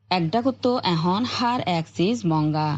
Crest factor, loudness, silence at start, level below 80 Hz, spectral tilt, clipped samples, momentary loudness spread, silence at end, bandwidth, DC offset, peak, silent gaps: 16 dB; -23 LUFS; 0.1 s; -64 dBFS; -6.5 dB/octave; under 0.1%; 2 LU; 0 s; 8 kHz; under 0.1%; -6 dBFS; none